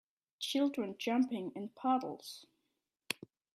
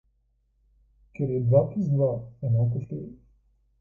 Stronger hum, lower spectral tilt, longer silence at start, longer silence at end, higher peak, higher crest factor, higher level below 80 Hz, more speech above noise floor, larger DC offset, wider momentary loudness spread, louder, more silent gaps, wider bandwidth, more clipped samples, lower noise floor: neither; second, -4 dB/octave vs -13 dB/octave; second, 0.4 s vs 1.2 s; second, 0.4 s vs 0.65 s; second, -14 dBFS vs -6 dBFS; about the same, 24 dB vs 20 dB; second, -86 dBFS vs -56 dBFS; first, 50 dB vs 44 dB; neither; second, 12 LU vs 15 LU; second, -37 LUFS vs -26 LUFS; neither; first, 15 kHz vs 2.7 kHz; neither; first, -85 dBFS vs -69 dBFS